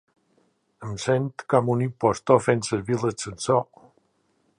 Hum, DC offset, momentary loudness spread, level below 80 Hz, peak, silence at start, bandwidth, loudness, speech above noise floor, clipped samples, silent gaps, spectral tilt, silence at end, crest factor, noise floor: none; under 0.1%; 11 LU; -58 dBFS; -4 dBFS; 0.8 s; 11 kHz; -24 LUFS; 45 dB; under 0.1%; none; -6 dB/octave; 0.95 s; 20 dB; -68 dBFS